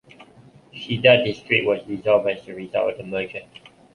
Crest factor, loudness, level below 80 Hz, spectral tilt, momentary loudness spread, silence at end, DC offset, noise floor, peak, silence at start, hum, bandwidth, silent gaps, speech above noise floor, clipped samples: 22 dB; -21 LUFS; -60 dBFS; -6.5 dB/octave; 17 LU; 0.5 s; under 0.1%; -50 dBFS; -2 dBFS; 0.2 s; none; 10.5 kHz; none; 29 dB; under 0.1%